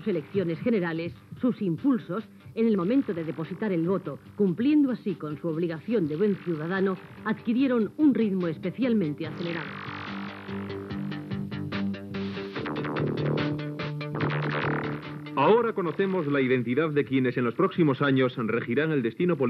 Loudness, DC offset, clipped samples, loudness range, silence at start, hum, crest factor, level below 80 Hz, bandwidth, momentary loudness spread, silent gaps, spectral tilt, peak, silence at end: -27 LUFS; under 0.1%; under 0.1%; 6 LU; 0 s; none; 18 dB; -64 dBFS; 6 kHz; 11 LU; none; -9 dB/octave; -10 dBFS; 0 s